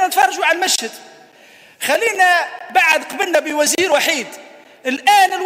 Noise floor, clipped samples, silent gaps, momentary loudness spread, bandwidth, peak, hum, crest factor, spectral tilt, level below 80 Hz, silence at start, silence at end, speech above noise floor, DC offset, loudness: -45 dBFS; under 0.1%; none; 10 LU; 16 kHz; 0 dBFS; none; 16 dB; 0 dB/octave; -74 dBFS; 0 s; 0 s; 29 dB; under 0.1%; -15 LUFS